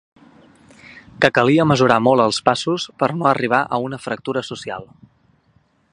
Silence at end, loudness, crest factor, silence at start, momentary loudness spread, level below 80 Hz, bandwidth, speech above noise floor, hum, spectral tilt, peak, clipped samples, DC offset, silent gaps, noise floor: 1.1 s; -17 LUFS; 20 dB; 0.9 s; 13 LU; -56 dBFS; 11 kHz; 42 dB; none; -5.5 dB/octave; 0 dBFS; under 0.1%; under 0.1%; none; -59 dBFS